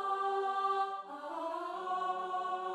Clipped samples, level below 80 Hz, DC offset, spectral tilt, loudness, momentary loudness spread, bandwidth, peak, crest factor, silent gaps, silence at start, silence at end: under 0.1%; -86 dBFS; under 0.1%; -3.5 dB/octave; -36 LUFS; 7 LU; 11.5 kHz; -24 dBFS; 12 dB; none; 0 s; 0 s